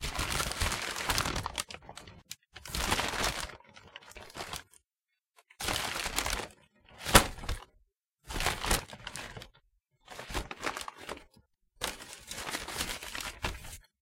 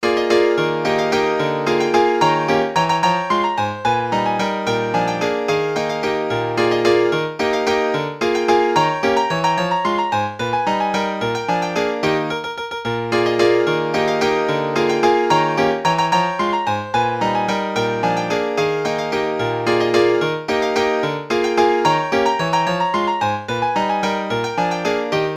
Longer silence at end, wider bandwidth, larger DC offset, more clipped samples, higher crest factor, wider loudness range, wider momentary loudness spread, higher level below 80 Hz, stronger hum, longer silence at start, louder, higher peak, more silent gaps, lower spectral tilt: first, 0.2 s vs 0 s; first, 17 kHz vs 15 kHz; neither; neither; first, 34 dB vs 16 dB; first, 8 LU vs 2 LU; first, 17 LU vs 5 LU; first, -44 dBFS vs -52 dBFS; neither; about the same, 0 s vs 0 s; second, -33 LUFS vs -18 LUFS; about the same, -2 dBFS vs -2 dBFS; neither; second, -2.5 dB/octave vs -5 dB/octave